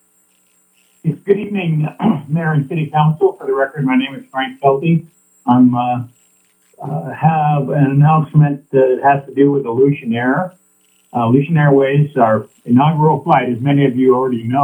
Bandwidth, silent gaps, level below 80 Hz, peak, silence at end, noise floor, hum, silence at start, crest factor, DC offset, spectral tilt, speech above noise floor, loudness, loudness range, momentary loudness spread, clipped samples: 9.2 kHz; none; -58 dBFS; 0 dBFS; 0 s; -57 dBFS; none; 1.05 s; 14 dB; under 0.1%; -9.5 dB/octave; 43 dB; -15 LUFS; 3 LU; 10 LU; under 0.1%